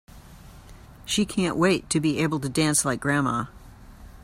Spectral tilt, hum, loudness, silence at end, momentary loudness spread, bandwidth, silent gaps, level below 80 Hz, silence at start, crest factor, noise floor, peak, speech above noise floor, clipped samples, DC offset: -4 dB/octave; none; -24 LUFS; 0 s; 7 LU; 16 kHz; none; -48 dBFS; 0.15 s; 18 dB; -46 dBFS; -8 dBFS; 22 dB; under 0.1%; under 0.1%